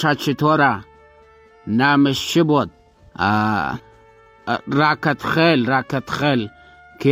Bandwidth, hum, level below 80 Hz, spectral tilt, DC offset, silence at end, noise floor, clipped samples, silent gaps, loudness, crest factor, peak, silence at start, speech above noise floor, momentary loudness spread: 16 kHz; none; -52 dBFS; -6 dB/octave; under 0.1%; 0 s; -49 dBFS; under 0.1%; none; -18 LUFS; 16 dB; -4 dBFS; 0 s; 31 dB; 12 LU